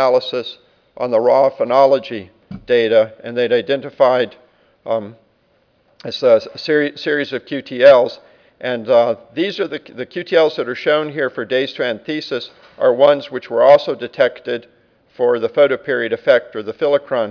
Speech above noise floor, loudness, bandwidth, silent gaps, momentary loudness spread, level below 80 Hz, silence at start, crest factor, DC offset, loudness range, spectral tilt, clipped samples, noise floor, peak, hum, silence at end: 43 dB; -16 LUFS; 5.4 kHz; none; 14 LU; -62 dBFS; 0 s; 16 dB; under 0.1%; 4 LU; -6 dB/octave; under 0.1%; -59 dBFS; 0 dBFS; none; 0 s